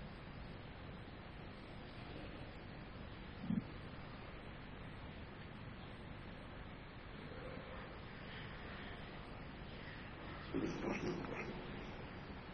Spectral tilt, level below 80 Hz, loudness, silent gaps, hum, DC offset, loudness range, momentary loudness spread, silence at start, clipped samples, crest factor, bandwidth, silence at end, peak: -6.5 dB/octave; -58 dBFS; -49 LUFS; none; none; under 0.1%; 6 LU; 10 LU; 0 s; under 0.1%; 20 dB; 8.8 kHz; 0 s; -28 dBFS